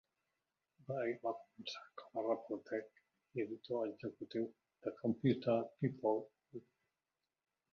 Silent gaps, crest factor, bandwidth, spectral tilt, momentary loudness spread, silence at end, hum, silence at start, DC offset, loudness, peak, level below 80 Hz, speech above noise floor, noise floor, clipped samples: none; 20 dB; 6.8 kHz; -6 dB/octave; 12 LU; 1.15 s; none; 0.9 s; under 0.1%; -41 LUFS; -22 dBFS; -82 dBFS; over 50 dB; under -90 dBFS; under 0.1%